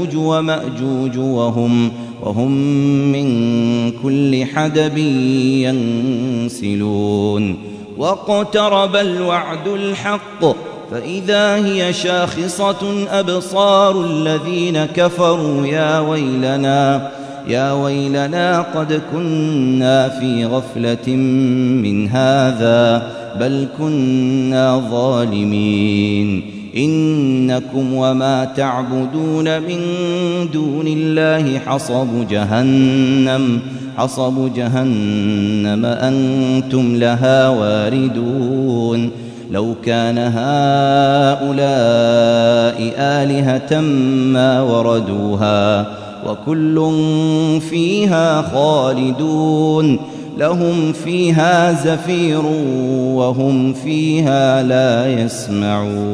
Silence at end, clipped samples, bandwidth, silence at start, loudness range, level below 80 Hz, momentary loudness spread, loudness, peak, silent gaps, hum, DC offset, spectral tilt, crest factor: 0 s; under 0.1%; 11 kHz; 0 s; 3 LU; -56 dBFS; 7 LU; -15 LUFS; 0 dBFS; none; none; under 0.1%; -6.5 dB/octave; 14 dB